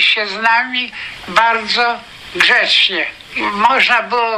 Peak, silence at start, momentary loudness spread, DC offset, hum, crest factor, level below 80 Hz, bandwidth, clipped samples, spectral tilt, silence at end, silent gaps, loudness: 0 dBFS; 0 s; 11 LU; under 0.1%; none; 14 dB; -52 dBFS; 15.5 kHz; under 0.1%; -1.5 dB/octave; 0 s; none; -13 LUFS